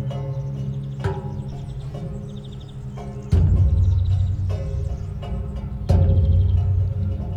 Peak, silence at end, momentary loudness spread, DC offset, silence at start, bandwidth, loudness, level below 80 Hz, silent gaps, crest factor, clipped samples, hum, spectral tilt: -6 dBFS; 0 s; 15 LU; under 0.1%; 0 s; 6.2 kHz; -23 LUFS; -28 dBFS; none; 14 dB; under 0.1%; none; -9 dB/octave